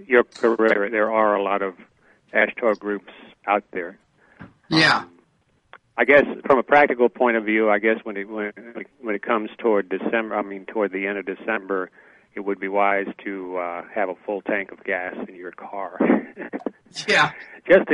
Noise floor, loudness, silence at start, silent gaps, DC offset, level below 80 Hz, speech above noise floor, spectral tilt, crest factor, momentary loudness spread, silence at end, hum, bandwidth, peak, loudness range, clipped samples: -64 dBFS; -22 LUFS; 0 s; none; under 0.1%; -64 dBFS; 42 dB; -5 dB/octave; 20 dB; 16 LU; 0 s; none; 11 kHz; -2 dBFS; 7 LU; under 0.1%